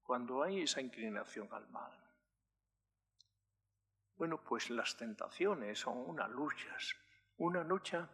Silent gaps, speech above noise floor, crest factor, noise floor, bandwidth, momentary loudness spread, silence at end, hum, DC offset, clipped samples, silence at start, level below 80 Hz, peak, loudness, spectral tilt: none; 48 dB; 20 dB; -90 dBFS; 13 kHz; 12 LU; 0 s; 50 Hz at -75 dBFS; under 0.1%; under 0.1%; 0.1 s; -90 dBFS; -22 dBFS; -41 LUFS; -3.5 dB/octave